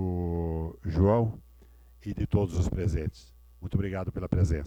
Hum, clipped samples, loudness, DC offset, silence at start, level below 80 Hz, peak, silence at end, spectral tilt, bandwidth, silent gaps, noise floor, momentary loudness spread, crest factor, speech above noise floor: none; under 0.1%; -30 LUFS; under 0.1%; 0 s; -38 dBFS; -10 dBFS; 0 s; -8.5 dB/octave; 8.8 kHz; none; -54 dBFS; 14 LU; 18 dB; 27 dB